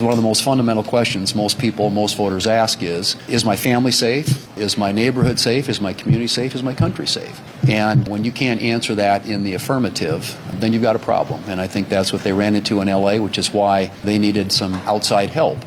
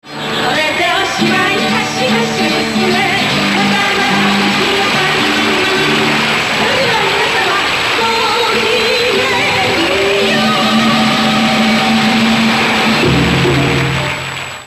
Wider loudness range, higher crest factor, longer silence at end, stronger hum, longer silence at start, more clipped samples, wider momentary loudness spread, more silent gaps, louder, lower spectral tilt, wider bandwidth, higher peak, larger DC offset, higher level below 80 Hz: about the same, 2 LU vs 1 LU; about the same, 12 dB vs 12 dB; about the same, 0 s vs 0 s; neither; about the same, 0 s vs 0.05 s; neither; first, 6 LU vs 2 LU; neither; second, -18 LUFS vs -11 LUFS; about the same, -5 dB/octave vs -4 dB/octave; first, 17.5 kHz vs 14 kHz; second, -4 dBFS vs 0 dBFS; neither; second, -48 dBFS vs -38 dBFS